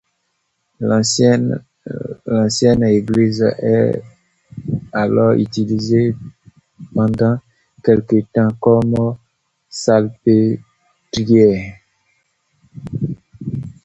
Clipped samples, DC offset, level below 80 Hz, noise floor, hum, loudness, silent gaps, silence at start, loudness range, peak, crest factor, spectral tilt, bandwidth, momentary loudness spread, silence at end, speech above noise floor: under 0.1%; under 0.1%; -48 dBFS; -69 dBFS; none; -16 LUFS; none; 0.8 s; 2 LU; 0 dBFS; 16 dB; -6.5 dB/octave; 8.2 kHz; 14 LU; 0.15 s; 55 dB